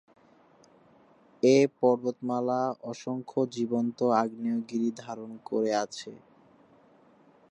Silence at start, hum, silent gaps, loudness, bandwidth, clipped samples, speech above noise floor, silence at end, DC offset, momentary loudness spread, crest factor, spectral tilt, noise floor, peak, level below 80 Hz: 1.45 s; none; none; -28 LUFS; 10 kHz; under 0.1%; 32 dB; 1.35 s; under 0.1%; 15 LU; 20 dB; -6 dB/octave; -60 dBFS; -10 dBFS; -80 dBFS